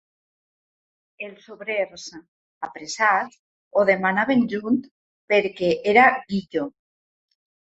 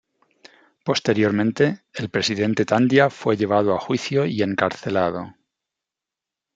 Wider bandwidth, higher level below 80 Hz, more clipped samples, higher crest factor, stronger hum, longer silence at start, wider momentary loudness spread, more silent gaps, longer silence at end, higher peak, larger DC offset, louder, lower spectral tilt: second, 8 kHz vs 9 kHz; about the same, -66 dBFS vs -64 dBFS; neither; about the same, 22 dB vs 20 dB; neither; first, 1.2 s vs 0.85 s; first, 19 LU vs 8 LU; first, 2.28-2.61 s, 3.39-3.71 s, 4.91-5.28 s vs none; second, 1.05 s vs 1.25 s; about the same, -2 dBFS vs -2 dBFS; neither; about the same, -21 LUFS vs -21 LUFS; about the same, -5 dB/octave vs -5.5 dB/octave